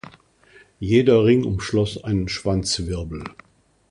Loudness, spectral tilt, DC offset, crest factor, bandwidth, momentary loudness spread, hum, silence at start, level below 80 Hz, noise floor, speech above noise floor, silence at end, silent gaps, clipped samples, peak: -20 LUFS; -6 dB/octave; under 0.1%; 18 dB; 11 kHz; 17 LU; none; 0.8 s; -40 dBFS; -53 dBFS; 33 dB; 0.6 s; none; under 0.1%; -4 dBFS